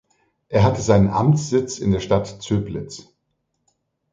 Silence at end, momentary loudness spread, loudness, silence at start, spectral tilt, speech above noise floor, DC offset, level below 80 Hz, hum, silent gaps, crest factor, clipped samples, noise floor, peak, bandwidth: 1.1 s; 14 LU; -20 LUFS; 0.5 s; -6.5 dB/octave; 54 dB; under 0.1%; -42 dBFS; none; none; 18 dB; under 0.1%; -73 dBFS; -2 dBFS; 9.2 kHz